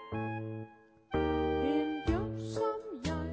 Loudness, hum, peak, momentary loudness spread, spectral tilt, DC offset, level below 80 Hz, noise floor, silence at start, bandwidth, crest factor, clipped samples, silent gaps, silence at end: -34 LUFS; none; -18 dBFS; 10 LU; -7 dB/octave; under 0.1%; -46 dBFS; -54 dBFS; 0 s; 8 kHz; 16 dB; under 0.1%; none; 0 s